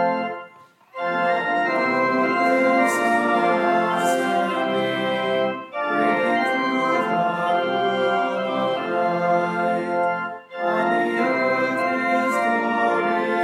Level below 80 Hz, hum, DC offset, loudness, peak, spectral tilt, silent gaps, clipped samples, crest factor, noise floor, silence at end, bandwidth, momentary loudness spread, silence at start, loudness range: -76 dBFS; none; under 0.1%; -21 LUFS; -6 dBFS; -5 dB/octave; none; under 0.1%; 14 dB; -49 dBFS; 0 s; 15 kHz; 5 LU; 0 s; 2 LU